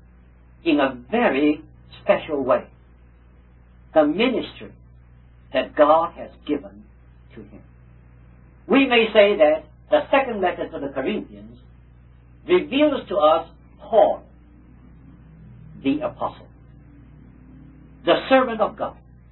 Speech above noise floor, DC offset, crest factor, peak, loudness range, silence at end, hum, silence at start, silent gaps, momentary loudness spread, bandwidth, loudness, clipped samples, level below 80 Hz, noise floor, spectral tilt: 30 dB; under 0.1%; 20 dB; -2 dBFS; 6 LU; 0.4 s; 60 Hz at -50 dBFS; 0.65 s; none; 14 LU; 4.2 kHz; -21 LUFS; under 0.1%; -50 dBFS; -50 dBFS; -9.5 dB/octave